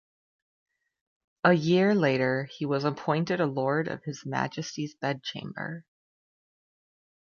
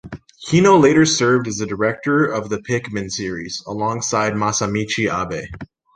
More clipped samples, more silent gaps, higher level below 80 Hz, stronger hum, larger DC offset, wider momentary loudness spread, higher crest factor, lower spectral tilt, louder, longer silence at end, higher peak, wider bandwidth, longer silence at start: neither; neither; second, -70 dBFS vs -48 dBFS; neither; neither; about the same, 14 LU vs 15 LU; first, 24 dB vs 16 dB; first, -6.5 dB/octave vs -4.5 dB/octave; second, -28 LUFS vs -18 LUFS; first, 1.5 s vs 0.3 s; second, -6 dBFS vs -2 dBFS; second, 7.2 kHz vs 10.5 kHz; first, 1.45 s vs 0.05 s